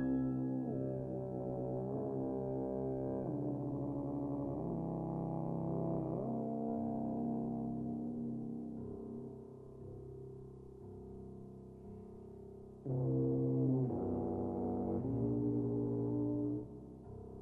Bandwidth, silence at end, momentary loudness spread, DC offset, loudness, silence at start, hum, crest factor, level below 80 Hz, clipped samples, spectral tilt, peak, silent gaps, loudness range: 1.9 kHz; 0 s; 16 LU; under 0.1%; -39 LUFS; 0 s; none; 14 dB; -60 dBFS; under 0.1%; -12.5 dB/octave; -24 dBFS; none; 12 LU